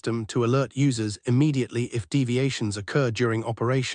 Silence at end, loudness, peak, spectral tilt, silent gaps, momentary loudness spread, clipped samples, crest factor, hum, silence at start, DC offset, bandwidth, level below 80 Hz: 0 s; -25 LUFS; -10 dBFS; -6 dB/octave; none; 5 LU; under 0.1%; 14 dB; none; 0.05 s; under 0.1%; 10 kHz; -62 dBFS